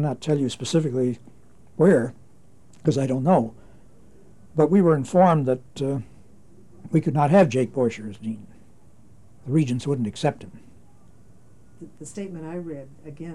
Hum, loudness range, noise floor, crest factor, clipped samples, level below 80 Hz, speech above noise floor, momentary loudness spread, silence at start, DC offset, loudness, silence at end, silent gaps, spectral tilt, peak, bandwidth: none; 7 LU; -55 dBFS; 18 dB; under 0.1%; -60 dBFS; 33 dB; 19 LU; 0 s; 0.5%; -22 LUFS; 0 s; none; -7.5 dB/octave; -6 dBFS; 11.5 kHz